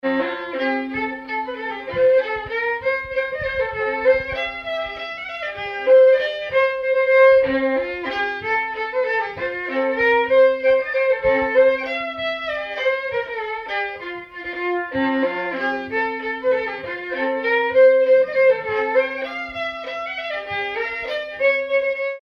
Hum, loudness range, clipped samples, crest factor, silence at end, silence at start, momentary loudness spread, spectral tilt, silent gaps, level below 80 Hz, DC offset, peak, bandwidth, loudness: none; 6 LU; under 0.1%; 14 dB; 0 s; 0.05 s; 12 LU; -5.5 dB/octave; none; -52 dBFS; under 0.1%; -6 dBFS; 6 kHz; -20 LUFS